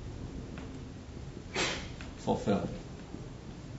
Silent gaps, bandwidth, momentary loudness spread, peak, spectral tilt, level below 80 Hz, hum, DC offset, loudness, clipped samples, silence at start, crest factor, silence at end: none; 7.6 kHz; 13 LU; -16 dBFS; -4.5 dB/octave; -50 dBFS; none; under 0.1%; -37 LUFS; under 0.1%; 0 s; 22 dB; 0 s